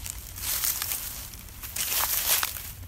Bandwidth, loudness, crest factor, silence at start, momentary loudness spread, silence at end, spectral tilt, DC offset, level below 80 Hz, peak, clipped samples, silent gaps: 16.5 kHz; -26 LUFS; 24 dB; 0 s; 14 LU; 0 s; 0 dB/octave; under 0.1%; -46 dBFS; -6 dBFS; under 0.1%; none